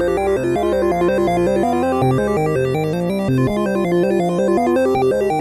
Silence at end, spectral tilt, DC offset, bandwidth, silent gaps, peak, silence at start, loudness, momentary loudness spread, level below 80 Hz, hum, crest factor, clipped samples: 0 s; -7.5 dB/octave; under 0.1%; 13.5 kHz; none; -6 dBFS; 0 s; -17 LUFS; 2 LU; -40 dBFS; none; 10 dB; under 0.1%